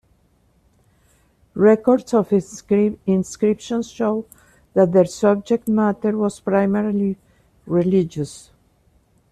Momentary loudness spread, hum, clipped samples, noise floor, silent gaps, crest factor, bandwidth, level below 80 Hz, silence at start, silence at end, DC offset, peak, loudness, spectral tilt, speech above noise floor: 10 LU; none; under 0.1%; -60 dBFS; none; 16 dB; 13 kHz; -56 dBFS; 1.55 s; 0.95 s; under 0.1%; -4 dBFS; -19 LUFS; -7.5 dB/octave; 41 dB